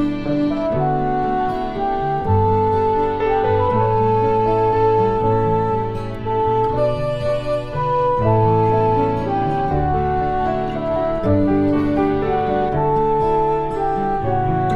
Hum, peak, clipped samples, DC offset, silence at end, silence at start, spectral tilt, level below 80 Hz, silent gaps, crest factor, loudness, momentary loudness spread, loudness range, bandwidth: none; -4 dBFS; under 0.1%; 0.8%; 0 s; 0 s; -9 dB/octave; -32 dBFS; none; 14 dB; -18 LUFS; 5 LU; 2 LU; 7.8 kHz